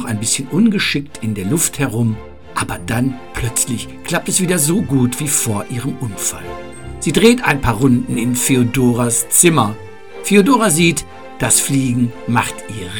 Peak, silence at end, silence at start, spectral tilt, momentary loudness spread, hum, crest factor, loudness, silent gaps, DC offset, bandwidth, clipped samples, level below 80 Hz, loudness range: 0 dBFS; 0 s; 0 s; -4 dB/octave; 12 LU; none; 16 dB; -15 LUFS; none; 2%; 19.5 kHz; under 0.1%; -38 dBFS; 5 LU